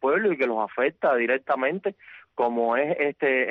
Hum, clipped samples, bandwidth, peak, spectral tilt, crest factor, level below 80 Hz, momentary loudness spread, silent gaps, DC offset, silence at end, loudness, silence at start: none; under 0.1%; 5.4 kHz; -12 dBFS; -8 dB/octave; 12 dB; -72 dBFS; 5 LU; none; under 0.1%; 0 s; -24 LUFS; 0 s